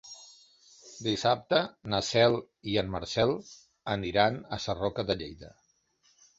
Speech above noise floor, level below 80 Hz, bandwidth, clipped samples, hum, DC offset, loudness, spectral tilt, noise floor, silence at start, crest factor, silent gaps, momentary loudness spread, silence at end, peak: 40 dB; -56 dBFS; 8 kHz; under 0.1%; none; under 0.1%; -29 LUFS; -4.5 dB/octave; -69 dBFS; 0.05 s; 22 dB; none; 17 LU; 0.9 s; -8 dBFS